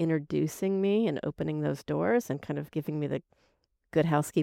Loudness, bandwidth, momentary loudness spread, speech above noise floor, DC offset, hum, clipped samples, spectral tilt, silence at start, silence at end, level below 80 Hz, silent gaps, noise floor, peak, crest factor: -30 LUFS; 16.5 kHz; 8 LU; 43 dB; under 0.1%; none; under 0.1%; -7 dB/octave; 0 s; 0 s; -62 dBFS; none; -72 dBFS; -14 dBFS; 16 dB